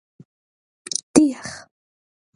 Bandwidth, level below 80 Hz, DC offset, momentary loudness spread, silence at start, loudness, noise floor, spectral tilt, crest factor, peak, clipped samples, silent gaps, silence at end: 11.5 kHz; -58 dBFS; under 0.1%; 23 LU; 0.9 s; -19 LUFS; under -90 dBFS; -3.5 dB/octave; 24 dB; 0 dBFS; under 0.1%; 1.03-1.14 s; 0.75 s